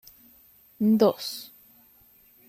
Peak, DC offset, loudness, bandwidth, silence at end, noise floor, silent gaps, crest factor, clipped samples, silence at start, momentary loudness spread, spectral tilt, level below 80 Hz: -8 dBFS; under 0.1%; -24 LUFS; 15.5 kHz; 1.05 s; -58 dBFS; none; 20 dB; under 0.1%; 0.8 s; 19 LU; -6 dB/octave; -70 dBFS